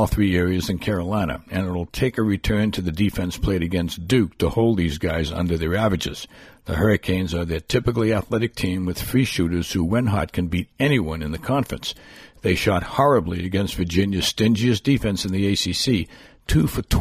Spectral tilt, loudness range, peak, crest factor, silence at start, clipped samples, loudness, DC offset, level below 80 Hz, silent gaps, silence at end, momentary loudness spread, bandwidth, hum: -6 dB/octave; 3 LU; -6 dBFS; 16 dB; 0 s; under 0.1%; -22 LUFS; under 0.1%; -36 dBFS; none; 0 s; 7 LU; 15.5 kHz; none